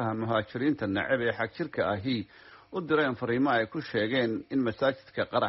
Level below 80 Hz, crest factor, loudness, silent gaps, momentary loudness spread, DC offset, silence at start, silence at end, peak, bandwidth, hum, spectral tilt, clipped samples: -64 dBFS; 16 dB; -29 LUFS; none; 6 LU; under 0.1%; 0 s; 0 s; -14 dBFS; 5.8 kHz; none; -4 dB/octave; under 0.1%